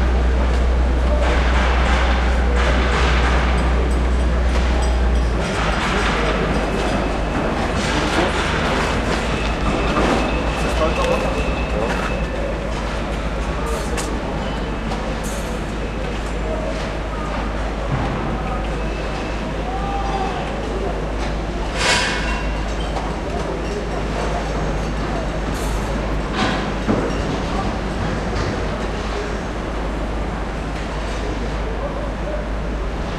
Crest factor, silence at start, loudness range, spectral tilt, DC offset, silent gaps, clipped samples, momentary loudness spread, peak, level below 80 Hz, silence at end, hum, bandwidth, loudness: 16 dB; 0 s; 6 LU; -5.5 dB/octave; under 0.1%; none; under 0.1%; 7 LU; -4 dBFS; -22 dBFS; 0 s; none; 12 kHz; -21 LUFS